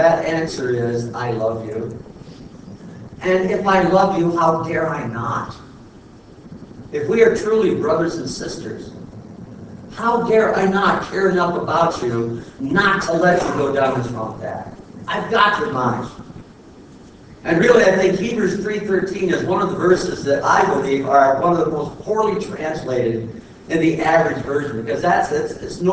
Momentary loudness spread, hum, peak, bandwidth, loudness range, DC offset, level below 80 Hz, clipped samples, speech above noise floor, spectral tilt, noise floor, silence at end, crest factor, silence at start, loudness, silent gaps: 21 LU; none; 0 dBFS; 8 kHz; 4 LU; under 0.1%; -48 dBFS; under 0.1%; 25 dB; -6 dB/octave; -42 dBFS; 0 s; 18 dB; 0 s; -18 LUFS; none